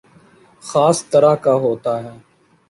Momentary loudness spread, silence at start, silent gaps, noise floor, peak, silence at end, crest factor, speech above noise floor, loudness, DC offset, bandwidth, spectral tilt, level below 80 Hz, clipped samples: 15 LU; 0.65 s; none; -49 dBFS; -2 dBFS; 0.55 s; 16 dB; 34 dB; -16 LUFS; under 0.1%; 11.5 kHz; -5.5 dB/octave; -60 dBFS; under 0.1%